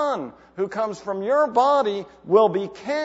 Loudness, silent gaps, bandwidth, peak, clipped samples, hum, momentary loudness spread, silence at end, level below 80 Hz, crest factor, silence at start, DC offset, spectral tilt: -22 LUFS; none; 8 kHz; -4 dBFS; under 0.1%; none; 12 LU; 0 s; -64 dBFS; 18 dB; 0 s; under 0.1%; -5.5 dB/octave